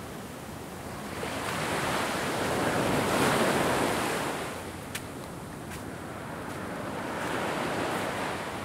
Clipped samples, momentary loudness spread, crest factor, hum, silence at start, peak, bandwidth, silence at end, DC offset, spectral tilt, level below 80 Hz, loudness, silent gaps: under 0.1%; 14 LU; 18 dB; none; 0 s; -14 dBFS; 16 kHz; 0 s; under 0.1%; -4 dB/octave; -54 dBFS; -31 LUFS; none